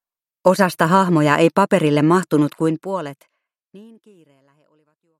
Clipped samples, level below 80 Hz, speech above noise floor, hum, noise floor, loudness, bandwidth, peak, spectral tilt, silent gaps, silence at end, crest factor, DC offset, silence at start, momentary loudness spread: under 0.1%; -64 dBFS; 46 dB; none; -63 dBFS; -17 LUFS; 16 kHz; 0 dBFS; -6.5 dB/octave; none; 1.35 s; 18 dB; under 0.1%; 0.45 s; 10 LU